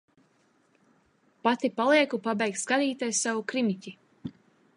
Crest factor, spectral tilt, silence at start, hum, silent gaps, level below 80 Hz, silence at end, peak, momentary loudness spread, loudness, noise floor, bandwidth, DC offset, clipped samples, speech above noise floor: 20 dB; -3 dB/octave; 1.45 s; none; none; -74 dBFS; 0.45 s; -10 dBFS; 21 LU; -27 LUFS; -67 dBFS; 11.5 kHz; under 0.1%; under 0.1%; 40 dB